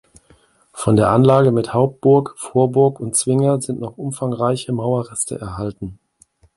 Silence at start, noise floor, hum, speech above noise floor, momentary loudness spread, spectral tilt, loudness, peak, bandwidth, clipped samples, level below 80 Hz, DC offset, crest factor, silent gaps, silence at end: 0.75 s; -55 dBFS; none; 38 dB; 14 LU; -6.5 dB/octave; -18 LUFS; 0 dBFS; 11.5 kHz; under 0.1%; -48 dBFS; under 0.1%; 18 dB; none; 0.65 s